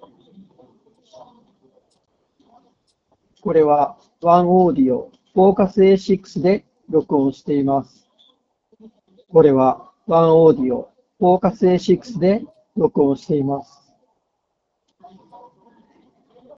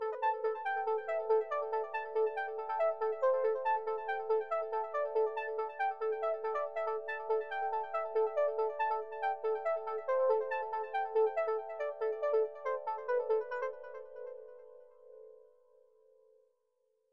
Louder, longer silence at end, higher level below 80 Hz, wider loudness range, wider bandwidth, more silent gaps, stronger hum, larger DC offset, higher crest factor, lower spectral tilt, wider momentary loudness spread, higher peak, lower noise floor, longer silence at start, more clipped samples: first, -17 LUFS vs -35 LUFS; first, 2.95 s vs 0 s; first, -54 dBFS vs under -90 dBFS; about the same, 8 LU vs 6 LU; first, 7.4 kHz vs 5.8 kHz; neither; neither; second, under 0.1% vs 0.1%; about the same, 18 dB vs 16 dB; first, -7.5 dB/octave vs -3 dB/octave; first, 10 LU vs 7 LU; first, 0 dBFS vs -20 dBFS; second, -74 dBFS vs -78 dBFS; first, 3.45 s vs 0 s; neither